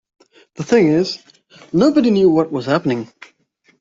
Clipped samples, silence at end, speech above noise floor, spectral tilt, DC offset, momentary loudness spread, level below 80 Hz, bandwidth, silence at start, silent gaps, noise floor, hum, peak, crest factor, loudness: under 0.1%; 0.75 s; 44 dB; -6.5 dB/octave; under 0.1%; 15 LU; -56 dBFS; 7.8 kHz; 0.6 s; none; -59 dBFS; none; -2 dBFS; 14 dB; -16 LUFS